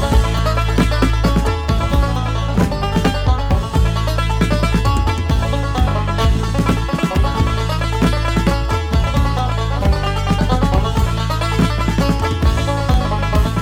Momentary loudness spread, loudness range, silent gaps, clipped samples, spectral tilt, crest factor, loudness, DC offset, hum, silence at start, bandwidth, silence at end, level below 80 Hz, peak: 2 LU; 0 LU; none; under 0.1%; -6 dB/octave; 14 dB; -17 LUFS; under 0.1%; none; 0 s; 15.5 kHz; 0 s; -18 dBFS; -2 dBFS